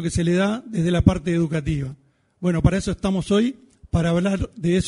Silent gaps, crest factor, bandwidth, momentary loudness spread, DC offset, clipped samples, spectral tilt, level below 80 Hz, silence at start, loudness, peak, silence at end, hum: none; 22 dB; 11 kHz; 7 LU; under 0.1%; under 0.1%; -6.5 dB/octave; -36 dBFS; 0 s; -22 LUFS; 0 dBFS; 0 s; none